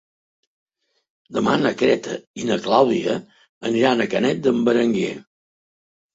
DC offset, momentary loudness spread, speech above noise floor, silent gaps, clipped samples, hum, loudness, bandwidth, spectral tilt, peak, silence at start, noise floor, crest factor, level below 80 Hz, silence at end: under 0.1%; 11 LU; over 71 dB; 2.27-2.34 s, 3.49-3.61 s; under 0.1%; none; -20 LUFS; 8 kHz; -5.5 dB/octave; -2 dBFS; 1.3 s; under -90 dBFS; 20 dB; -62 dBFS; 0.95 s